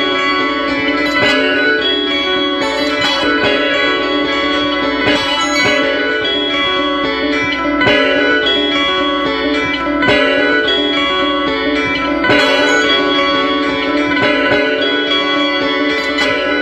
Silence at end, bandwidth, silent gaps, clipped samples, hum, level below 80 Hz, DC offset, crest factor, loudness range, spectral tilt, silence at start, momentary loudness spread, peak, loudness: 0 s; 12.5 kHz; none; under 0.1%; none; -40 dBFS; under 0.1%; 14 dB; 1 LU; -3.5 dB/octave; 0 s; 4 LU; 0 dBFS; -13 LUFS